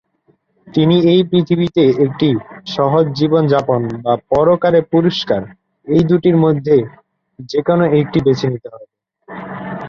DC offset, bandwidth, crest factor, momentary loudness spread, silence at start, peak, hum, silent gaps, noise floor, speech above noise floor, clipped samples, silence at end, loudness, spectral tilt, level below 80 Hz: under 0.1%; 7 kHz; 14 dB; 12 LU; 0.65 s; -2 dBFS; none; none; -59 dBFS; 45 dB; under 0.1%; 0 s; -14 LUFS; -8 dB/octave; -48 dBFS